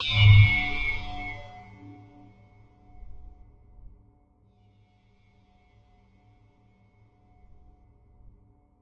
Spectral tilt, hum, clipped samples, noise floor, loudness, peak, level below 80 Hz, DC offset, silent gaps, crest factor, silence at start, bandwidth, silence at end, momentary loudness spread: -6 dB/octave; none; under 0.1%; -62 dBFS; -21 LUFS; -6 dBFS; -40 dBFS; under 0.1%; none; 22 dB; 0 s; 5.8 kHz; 5.55 s; 32 LU